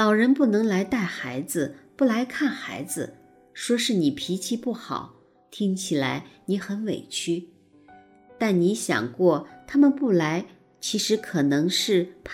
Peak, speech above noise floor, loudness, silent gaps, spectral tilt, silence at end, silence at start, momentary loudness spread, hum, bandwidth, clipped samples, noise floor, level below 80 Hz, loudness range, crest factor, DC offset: -8 dBFS; 29 dB; -25 LUFS; none; -4.5 dB/octave; 0 s; 0 s; 12 LU; none; 16.5 kHz; under 0.1%; -53 dBFS; -64 dBFS; 6 LU; 18 dB; under 0.1%